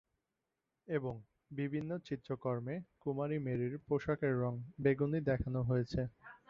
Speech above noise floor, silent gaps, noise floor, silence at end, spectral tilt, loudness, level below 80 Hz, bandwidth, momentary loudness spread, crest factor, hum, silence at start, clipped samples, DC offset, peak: 51 dB; none; -88 dBFS; 0.15 s; -8 dB/octave; -38 LUFS; -58 dBFS; 7 kHz; 8 LU; 20 dB; none; 0.9 s; under 0.1%; under 0.1%; -18 dBFS